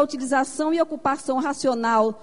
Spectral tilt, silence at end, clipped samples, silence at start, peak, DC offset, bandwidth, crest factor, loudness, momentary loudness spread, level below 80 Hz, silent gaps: -4 dB/octave; 0.05 s; under 0.1%; 0 s; -8 dBFS; 0.5%; 11 kHz; 16 dB; -23 LUFS; 4 LU; -64 dBFS; none